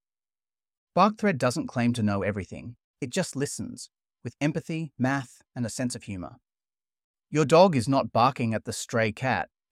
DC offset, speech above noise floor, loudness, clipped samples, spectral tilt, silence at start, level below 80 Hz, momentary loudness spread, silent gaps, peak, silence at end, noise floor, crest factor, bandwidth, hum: under 0.1%; over 64 dB; -26 LUFS; under 0.1%; -5.5 dB/octave; 0.95 s; -62 dBFS; 18 LU; 2.84-2.94 s, 7.04-7.14 s; -6 dBFS; 0.25 s; under -90 dBFS; 22 dB; 15.5 kHz; none